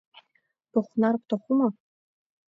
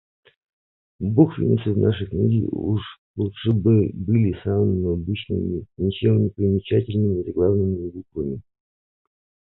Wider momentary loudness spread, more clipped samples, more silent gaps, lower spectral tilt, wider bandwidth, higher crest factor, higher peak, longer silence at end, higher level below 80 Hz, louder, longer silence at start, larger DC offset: second, 5 LU vs 11 LU; neither; second, none vs 2.98-3.14 s; second, -9 dB/octave vs -12.5 dB/octave; about the same, 4.5 kHz vs 4.1 kHz; about the same, 16 dB vs 20 dB; second, -12 dBFS vs -2 dBFS; second, 0.8 s vs 1.15 s; second, -78 dBFS vs -40 dBFS; second, -26 LUFS vs -22 LUFS; second, 0.75 s vs 1 s; neither